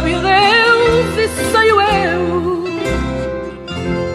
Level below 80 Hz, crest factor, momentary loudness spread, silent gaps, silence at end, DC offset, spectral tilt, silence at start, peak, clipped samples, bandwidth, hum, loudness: -32 dBFS; 14 dB; 12 LU; none; 0 s; under 0.1%; -4.5 dB/octave; 0 s; 0 dBFS; under 0.1%; 15 kHz; none; -14 LUFS